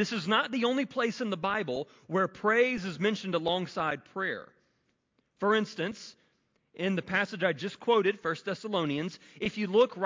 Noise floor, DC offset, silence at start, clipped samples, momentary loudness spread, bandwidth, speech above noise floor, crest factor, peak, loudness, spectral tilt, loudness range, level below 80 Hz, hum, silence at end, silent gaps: -75 dBFS; under 0.1%; 0 s; under 0.1%; 9 LU; 7.6 kHz; 45 dB; 18 dB; -12 dBFS; -30 LUFS; -5.5 dB/octave; 4 LU; -70 dBFS; none; 0 s; none